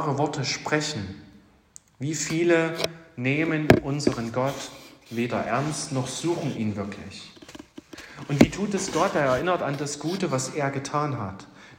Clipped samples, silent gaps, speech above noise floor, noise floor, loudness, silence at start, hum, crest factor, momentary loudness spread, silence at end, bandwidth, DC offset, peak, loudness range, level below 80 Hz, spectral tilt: under 0.1%; none; 28 dB; -54 dBFS; -26 LUFS; 0 s; none; 26 dB; 19 LU; 0.05 s; 16 kHz; under 0.1%; 0 dBFS; 5 LU; -54 dBFS; -5 dB/octave